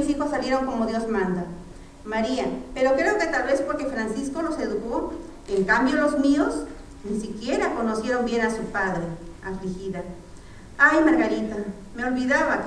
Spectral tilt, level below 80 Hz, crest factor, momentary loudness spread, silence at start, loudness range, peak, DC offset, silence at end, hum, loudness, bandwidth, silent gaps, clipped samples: -5.5 dB/octave; -44 dBFS; 20 dB; 15 LU; 0 s; 3 LU; -4 dBFS; under 0.1%; 0 s; none; -24 LUFS; 11 kHz; none; under 0.1%